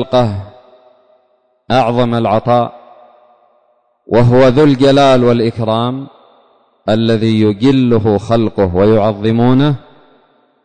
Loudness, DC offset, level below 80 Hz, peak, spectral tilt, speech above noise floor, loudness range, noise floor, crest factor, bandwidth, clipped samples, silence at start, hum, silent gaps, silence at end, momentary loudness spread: -12 LUFS; under 0.1%; -38 dBFS; -2 dBFS; -8 dB/octave; 47 dB; 5 LU; -57 dBFS; 10 dB; 9.4 kHz; under 0.1%; 0 s; none; none; 0.85 s; 8 LU